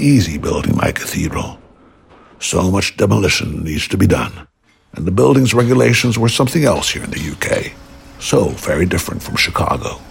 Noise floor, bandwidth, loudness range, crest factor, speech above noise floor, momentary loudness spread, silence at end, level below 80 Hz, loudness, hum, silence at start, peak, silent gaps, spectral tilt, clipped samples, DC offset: -46 dBFS; 16.5 kHz; 4 LU; 14 dB; 31 dB; 10 LU; 0 s; -34 dBFS; -15 LUFS; none; 0 s; -2 dBFS; none; -5 dB/octave; under 0.1%; under 0.1%